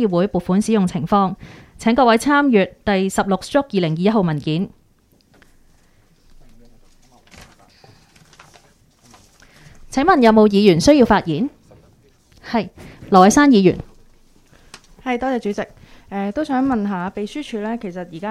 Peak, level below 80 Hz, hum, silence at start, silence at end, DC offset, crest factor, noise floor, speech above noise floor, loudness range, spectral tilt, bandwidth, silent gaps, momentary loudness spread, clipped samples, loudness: 0 dBFS; -44 dBFS; none; 0 s; 0 s; under 0.1%; 18 dB; -56 dBFS; 40 dB; 8 LU; -6 dB/octave; 14 kHz; none; 15 LU; under 0.1%; -17 LUFS